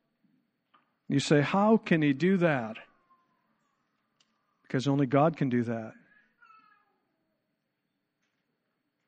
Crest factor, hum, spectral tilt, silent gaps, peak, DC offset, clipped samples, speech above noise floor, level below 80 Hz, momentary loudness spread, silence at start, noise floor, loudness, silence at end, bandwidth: 20 dB; none; -6.5 dB/octave; none; -10 dBFS; under 0.1%; under 0.1%; 55 dB; -74 dBFS; 13 LU; 1.1 s; -82 dBFS; -27 LUFS; 3.15 s; 9.4 kHz